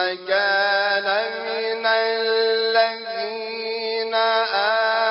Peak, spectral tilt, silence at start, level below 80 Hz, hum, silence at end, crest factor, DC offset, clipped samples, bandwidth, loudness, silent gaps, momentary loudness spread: -6 dBFS; 2.5 dB/octave; 0 s; -74 dBFS; none; 0 s; 16 dB; under 0.1%; under 0.1%; 5.8 kHz; -21 LUFS; none; 8 LU